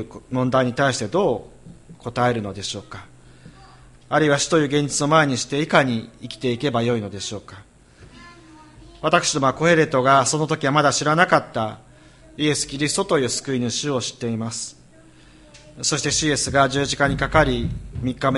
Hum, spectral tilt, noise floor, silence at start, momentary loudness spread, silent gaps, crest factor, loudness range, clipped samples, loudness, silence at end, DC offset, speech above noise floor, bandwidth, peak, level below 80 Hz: none; -4 dB/octave; -48 dBFS; 0 s; 12 LU; none; 22 dB; 6 LU; under 0.1%; -20 LUFS; 0 s; under 0.1%; 28 dB; 11.5 kHz; 0 dBFS; -44 dBFS